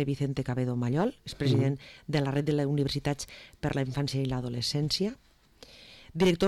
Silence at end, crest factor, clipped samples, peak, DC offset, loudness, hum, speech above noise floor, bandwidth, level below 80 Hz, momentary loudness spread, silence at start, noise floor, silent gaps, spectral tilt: 0 s; 12 dB; under 0.1%; -18 dBFS; under 0.1%; -30 LUFS; none; 26 dB; 13 kHz; -52 dBFS; 10 LU; 0 s; -55 dBFS; none; -6 dB/octave